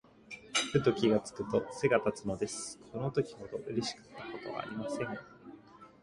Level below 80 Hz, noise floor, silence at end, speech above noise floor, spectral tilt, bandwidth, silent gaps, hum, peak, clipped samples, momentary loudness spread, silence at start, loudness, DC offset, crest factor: -64 dBFS; -55 dBFS; 0.15 s; 21 dB; -4.5 dB/octave; 11.5 kHz; none; none; -14 dBFS; under 0.1%; 18 LU; 0.3 s; -34 LUFS; under 0.1%; 20 dB